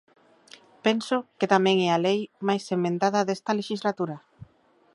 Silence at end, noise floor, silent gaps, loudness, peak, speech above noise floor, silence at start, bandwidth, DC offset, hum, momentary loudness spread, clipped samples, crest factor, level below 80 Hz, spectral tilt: 0.5 s; -62 dBFS; none; -25 LUFS; -4 dBFS; 37 dB; 0.85 s; 11.5 kHz; under 0.1%; none; 8 LU; under 0.1%; 22 dB; -72 dBFS; -5.5 dB/octave